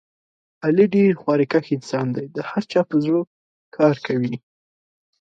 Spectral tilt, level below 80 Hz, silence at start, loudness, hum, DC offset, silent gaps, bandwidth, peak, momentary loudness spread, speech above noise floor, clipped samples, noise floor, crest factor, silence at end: -8 dB/octave; -68 dBFS; 0.65 s; -20 LUFS; none; under 0.1%; 3.27-3.72 s; 8 kHz; -2 dBFS; 11 LU; over 71 dB; under 0.1%; under -90 dBFS; 18 dB; 0.85 s